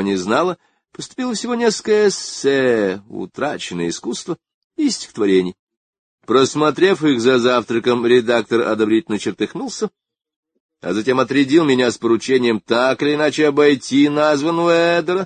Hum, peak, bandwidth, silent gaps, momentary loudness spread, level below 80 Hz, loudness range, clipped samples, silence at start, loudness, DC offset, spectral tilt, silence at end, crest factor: none; -2 dBFS; 9.6 kHz; 4.54-4.70 s, 5.59-5.67 s, 5.77-5.93 s, 5.99-6.18 s, 10.36-10.43 s, 10.60-10.69 s; 11 LU; -60 dBFS; 5 LU; under 0.1%; 0 s; -17 LUFS; under 0.1%; -4.5 dB/octave; 0 s; 16 dB